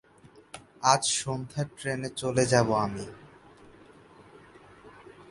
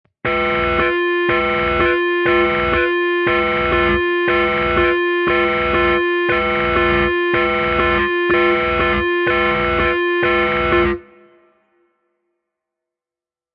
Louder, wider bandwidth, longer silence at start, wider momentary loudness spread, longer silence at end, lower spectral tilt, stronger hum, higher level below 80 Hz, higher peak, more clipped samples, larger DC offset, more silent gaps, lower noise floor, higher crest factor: second, -27 LUFS vs -16 LUFS; first, 11.5 kHz vs 5.2 kHz; about the same, 0.25 s vs 0.25 s; first, 21 LU vs 2 LU; second, 0.05 s vs 2.55 s; second, -4 dB/octave vs -8 dB/octave; neither; second, -60 dBFS vs -34 dBFS; about the same, -4 dBFS vs -4 dBFS; neither; neither; neither; second, -56 dBFS vs under -90 dBFS; first, 28 dB vs 14 dB